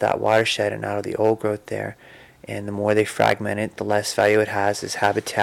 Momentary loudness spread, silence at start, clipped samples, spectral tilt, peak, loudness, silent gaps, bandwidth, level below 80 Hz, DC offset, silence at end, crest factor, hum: 11 LU; 0 s; under 0.1%; -4.5 dB/octave; -8 dBFS; -22 LUFS; none; 17.5 kHz; -60 dBFS; under 0.1%; 0 s; 14 dB; none